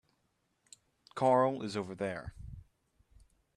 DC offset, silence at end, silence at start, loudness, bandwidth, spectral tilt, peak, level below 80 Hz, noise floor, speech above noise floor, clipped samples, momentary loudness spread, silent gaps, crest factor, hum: under 0.1%; 0.95 s; 1.15 s; -32 LUFS; 11.5 kHz; -6.5 dB/octave; -16 dBFS; -60 dBFS; -78 dBFS; 46 dB; under 0.1%; 24 LU; none; 22 dB; none